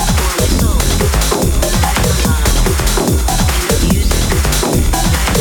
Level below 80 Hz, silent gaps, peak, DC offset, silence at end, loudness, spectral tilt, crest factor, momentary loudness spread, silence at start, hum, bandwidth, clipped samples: -16 dBFS; none; 0 dBFS; under 0.1%; 0 s; -13 LUFS; -4 dB/octave; 12 dB; 1 LU; 0 s; none; over 20 kHz; under 0.1%